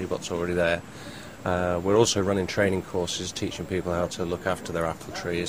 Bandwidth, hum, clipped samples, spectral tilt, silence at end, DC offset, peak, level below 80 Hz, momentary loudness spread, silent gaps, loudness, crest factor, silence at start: 15.5 kHz; none; under 0.1%; -4.5 dB/octave; 0 s; 0.2%; -6 dBFS; -50 dBFS; 10 LU; none; -27 LUFS; 20 dB; 0 s